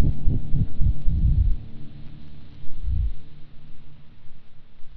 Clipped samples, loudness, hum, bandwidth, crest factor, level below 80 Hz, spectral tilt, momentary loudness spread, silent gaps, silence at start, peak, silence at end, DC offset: under 0.1%; -27 LUFS; none; 3.8 kHz; 14 dB; -26 dBFS; -10.5 dB/octave; 22 LU; none; 0 s; -4 dBFS; 0 s; under 0.1%